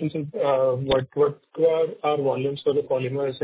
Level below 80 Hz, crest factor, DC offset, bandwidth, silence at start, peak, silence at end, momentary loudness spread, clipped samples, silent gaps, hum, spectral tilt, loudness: -54 dBFS; 14 dB; under 0.1%; 4 kHz; 0 s; -10 dBFS; 0 s; 5 LU; under 0.1%; none; none; -10.5 dB/octave; -24 LUFS